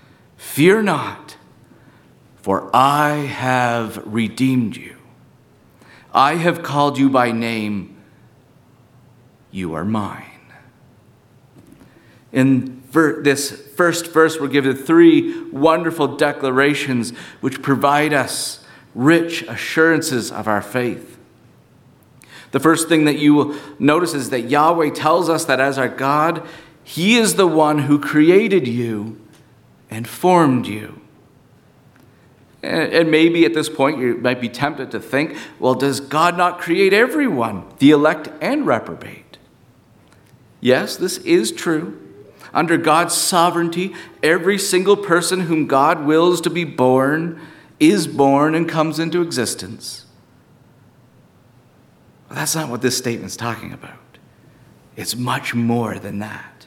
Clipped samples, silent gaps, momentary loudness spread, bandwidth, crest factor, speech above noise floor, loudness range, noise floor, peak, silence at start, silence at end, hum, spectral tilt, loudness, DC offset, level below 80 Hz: under 0.1%; none; 14 LU; 17 kHz; 18 dB; 34 dB; 9 LU; -51 dBFS; 0 dBFS; 0.4 s; 0.2 s; none; -4.5 dB/octave; -17 LUFS; under 0.1%; -62 dBFS